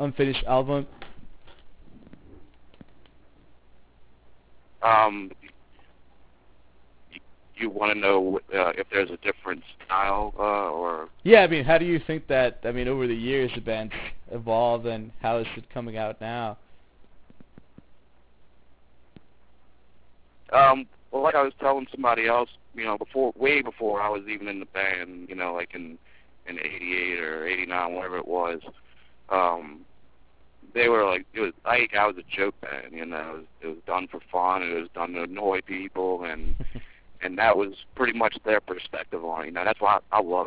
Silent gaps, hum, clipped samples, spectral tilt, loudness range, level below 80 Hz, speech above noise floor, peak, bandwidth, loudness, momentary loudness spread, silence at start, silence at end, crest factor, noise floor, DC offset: none; none; under 0.1%; -8.5 dB/octave; 8 LU; -48 dBFS; 34 dB; -2 dBFS; 4 kHz; -25 LUFS; 14 LU; 0 s; 0 s; 26 dB; -60 dBFS; 0.2%